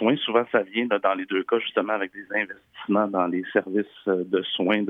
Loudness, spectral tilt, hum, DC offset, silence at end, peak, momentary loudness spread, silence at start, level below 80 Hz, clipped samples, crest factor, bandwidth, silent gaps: -25 LUFS; -8 dB/octave; none; under 0.1%; 0 s; -6 dBFS; 5 LU; 0 s; -76 dBFS; under 0.1%; 18 dB; 3.9 kHz; none